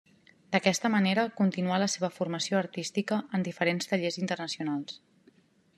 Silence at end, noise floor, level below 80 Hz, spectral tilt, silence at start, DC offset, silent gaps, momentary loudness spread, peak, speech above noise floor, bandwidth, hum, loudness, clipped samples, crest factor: 0.8 s; -63 dBFS; -78 dBFS; -4.5 dB/octave; 0.5 s; under 0.1%; none; 7 LU; -8 dBFS; 34 dB; 13 kHz; none; -29 LUFS; under 0.1%; 22 dB